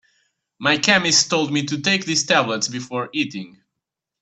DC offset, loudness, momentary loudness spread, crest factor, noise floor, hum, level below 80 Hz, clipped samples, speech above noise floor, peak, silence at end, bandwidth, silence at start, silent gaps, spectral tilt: under 0.1%; -19 LUFS; 11 LU; 22 dB; -83 dBFS; none; -62 dBFS; under 0.1%; 63 dB; 0 dBFS; 0.75 s; 9.2 kHz; 0.6 s; none; -2.5 dB/octave